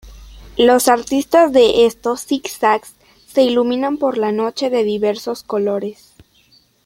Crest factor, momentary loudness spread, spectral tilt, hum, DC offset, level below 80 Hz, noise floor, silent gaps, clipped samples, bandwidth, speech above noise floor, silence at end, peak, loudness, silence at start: 16 dB; 11 LU; -3.5 dB/octave; none; under 0.1%; -48 dBFS; -54 dBFS; none; under 0.1%; 16.5 kHz; 39 dB; 0.9 s; -2 dBFS; -16 LUFS; 0.05 s